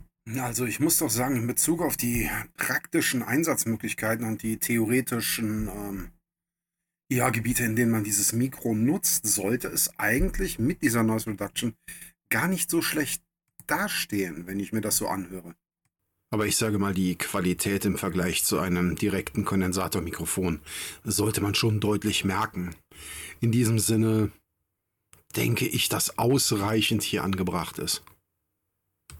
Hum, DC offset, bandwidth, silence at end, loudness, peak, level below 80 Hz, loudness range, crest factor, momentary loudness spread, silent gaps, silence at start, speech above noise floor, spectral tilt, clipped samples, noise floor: none; under 0.1%; 18 kHz; 0 s; -26 LUFS; -12 dBFS; -46 dBFS; 4 LU; 16 dB; 10 LU; none; 0 s; 64 dB; -4 dB/octave; under 0.1%; -90 dBFS